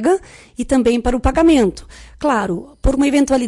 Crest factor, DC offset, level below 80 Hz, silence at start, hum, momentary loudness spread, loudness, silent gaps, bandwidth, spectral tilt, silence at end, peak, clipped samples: 10 dB; under 0.1%; -28 dBFS; 0 s; none; 11 LU; -16 LUFS; none; 11.5 kHz; -5.5 dB/octave; 0 s; -6 dBFS; under 0.1%